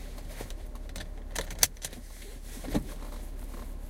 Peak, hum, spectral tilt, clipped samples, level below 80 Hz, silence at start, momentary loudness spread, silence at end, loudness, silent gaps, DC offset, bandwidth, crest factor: -2 dBFS; none; -2.5 dB/octave; under 0.1%; -40 dBFS; 0 s; 17 LU; 0 s; -35 LUFS; none; under 0.1%; 17 kHz; 34 dB